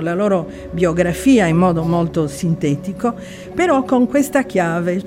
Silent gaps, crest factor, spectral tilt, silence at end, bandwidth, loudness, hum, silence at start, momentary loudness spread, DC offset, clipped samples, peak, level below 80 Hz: none; 14 dB; -6.5 dB/octave; 0 s; 16 kHz; -17 LUFS; none; 0 s; 9 LU; under 0.1%; under 0.1%; -2 dBFS; -42 dBFS